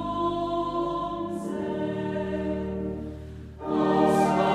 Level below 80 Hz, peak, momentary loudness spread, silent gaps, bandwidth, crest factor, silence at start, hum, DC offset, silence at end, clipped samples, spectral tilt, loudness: -48 dBFS; -8 dBFS; 14 LU; none; 14 kHz; 18 dB; 0 s; none; under 0.1%; 0 s; under 0.1%; -7 dB/octave; -27 LUFS